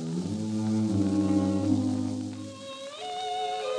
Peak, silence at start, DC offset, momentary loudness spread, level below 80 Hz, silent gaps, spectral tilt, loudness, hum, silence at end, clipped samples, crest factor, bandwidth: -12 dBFS; 0 s; under 0.1%; 13 LU; -70 dBFS; none; -6.5 dB/octave; -29 LUFS; none; 0 s; under 0.1%; 16 dB; 10.5 kHz